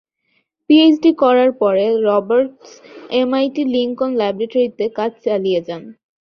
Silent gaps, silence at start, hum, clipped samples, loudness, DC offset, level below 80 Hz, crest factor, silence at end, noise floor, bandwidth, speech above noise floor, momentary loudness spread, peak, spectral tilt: none; 0.7 s; none; under 0.1%; -16 LUFS; under 0.1%; -62 dBFS; 14 dB; 0.3 s; -66 dBFS; 6.4 kHz; 50 dB; 10 LU; -2 dBFS; -6.5 dB/octave